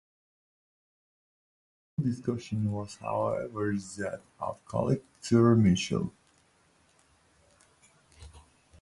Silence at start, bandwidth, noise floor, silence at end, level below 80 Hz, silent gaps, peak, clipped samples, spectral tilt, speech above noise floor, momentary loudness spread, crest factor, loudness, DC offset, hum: 2 s; 11.5 kHz; -66 dBFS; 0.45 s; -56 dBFS; none; -12 dBFS; under 0.1%; -6.5 dB/octave; 37 dB; 15 LU; 20 dB; -30 LUFS; under 0.1%; none